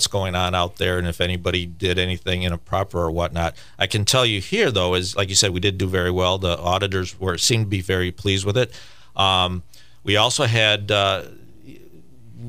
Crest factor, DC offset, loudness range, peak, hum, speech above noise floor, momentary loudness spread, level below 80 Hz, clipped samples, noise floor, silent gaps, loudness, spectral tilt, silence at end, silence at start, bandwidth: 20 dB; 0.8%; 3 LU; -2 dBFS; none; 27 dB; 8 LU; -42 dBFS; under 0.1%; -48 dBFS; none; -20 LUFS; -3.5 dB/octave; 0 s; 0 s; 15.5 kHz